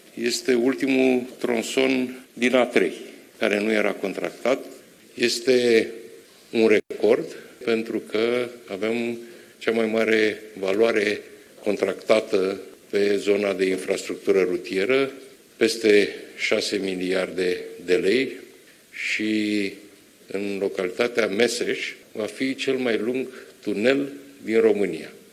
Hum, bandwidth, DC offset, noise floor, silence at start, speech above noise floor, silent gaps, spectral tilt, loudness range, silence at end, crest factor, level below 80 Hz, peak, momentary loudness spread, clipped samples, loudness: none; 15 kHz; under 0.1%; -50 dBFS; 0.15 s; 27 dB; none; -4 dB/octave; 3 LU; 0.15 s; 20 dB; -74 dBFS; -4 dBFS; 12 LU; under 0.1%; -23 LUFS